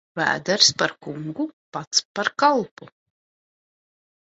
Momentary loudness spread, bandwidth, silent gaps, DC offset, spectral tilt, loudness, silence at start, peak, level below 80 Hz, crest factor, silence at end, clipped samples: 16 LU; 8.2 kHz; 1.53-1.72 s, 1.87-1.91 s, 2.05-2.15 s, 2.71-2.77 s; under 0.1%; -2 dB/octave; -21 LUFS; 0.15 s; 0 dBFS; -66 dBFS; 24 dB; 1.35 s; under 0.1%